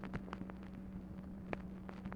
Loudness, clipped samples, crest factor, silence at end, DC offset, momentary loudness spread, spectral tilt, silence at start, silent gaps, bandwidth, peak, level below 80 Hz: -48 LUFS; under 0.1%; 26 dB; 0 s; under 0.1%; 4 LU; -8 dB/octave; 0 s; none; 9.6 kHz; -22 dBFS; -56 dBFS